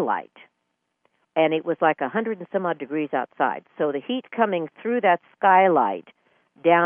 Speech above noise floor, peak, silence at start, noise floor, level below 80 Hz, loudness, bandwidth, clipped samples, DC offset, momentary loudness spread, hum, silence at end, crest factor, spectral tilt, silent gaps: 54 dB; -4 dBFS; 0 s; -76 dBFS; -78 dBFS; -23 LUFS; 3.6 kHz; under 0.1%; under 0.1%; 10 LU; none; 0 s; 18 dB; -9.5 dB/octave; none